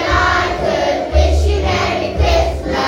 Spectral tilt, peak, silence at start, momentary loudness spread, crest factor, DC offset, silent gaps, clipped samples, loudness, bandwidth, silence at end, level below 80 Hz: -5.5 dB/octave; 0 dBFS; 0 s; 3 LU; 14 dB; under 0.1%; none; under 0.1%; -15 LUFS; 10.5 kHz; 0 s; -18 dBFS